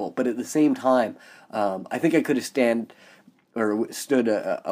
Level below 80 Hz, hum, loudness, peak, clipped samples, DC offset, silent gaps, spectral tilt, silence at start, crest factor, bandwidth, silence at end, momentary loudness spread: -78 dBFS; none; -24 LUFS; -8 dBFS; under 0.1%; under 0.1%; none; -5 dB/octave; 0 s; 16 dB; 15.5 kHz; 0 s; 8 LU